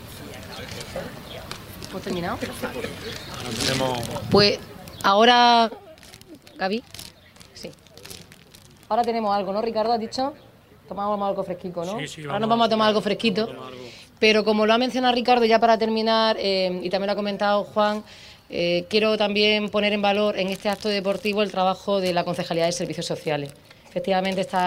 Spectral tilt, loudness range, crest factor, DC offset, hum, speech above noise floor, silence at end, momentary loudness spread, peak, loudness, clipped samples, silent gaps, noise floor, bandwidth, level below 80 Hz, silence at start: -4.5 dB/octave; 8 LU; 18 dB; under 0.1%; none; 27 dB; 0 s; 19 LU; -4 dBFS; -22 LUFS; under 0.1%; none; -49 dBFS; 16 kHz; -54 dBFS; 0 s